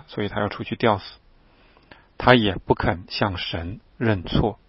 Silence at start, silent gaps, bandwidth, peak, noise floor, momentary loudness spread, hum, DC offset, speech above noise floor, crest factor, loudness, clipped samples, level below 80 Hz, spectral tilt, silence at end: 0.1 s; none; 5.8 kHz; 0 dBFS; -55 dBFS; 11 LU; none; under 0.1%; 32 dB; 24 dB; -23 LUFS; under 0.1%; -40 dBFS; -9 dB/octave; 0.15 s